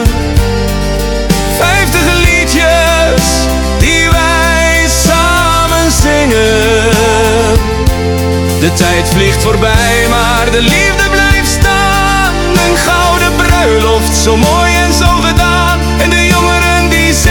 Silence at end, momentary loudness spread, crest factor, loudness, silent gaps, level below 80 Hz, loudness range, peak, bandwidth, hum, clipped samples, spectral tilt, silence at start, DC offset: 0 s; 4 LU; 8 dB; -8 LUFS; none; -16 dBFS; 1 LU; 0 dBFS; 19 kHz; none; 0.6%; -4 dB/octave; 0 s; under 0.1%